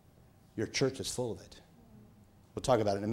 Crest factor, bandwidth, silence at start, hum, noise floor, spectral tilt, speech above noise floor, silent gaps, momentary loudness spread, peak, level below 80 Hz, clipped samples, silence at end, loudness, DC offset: 22 dB; 16 kHz; 0.55 s; none; -61 dBFS; -4.5 dB/octave; 28 dB; none; 17 LU; -14 dBFS; -60 dBFS; under 0.1%; 0 s; -33 LUFS; under 0.1%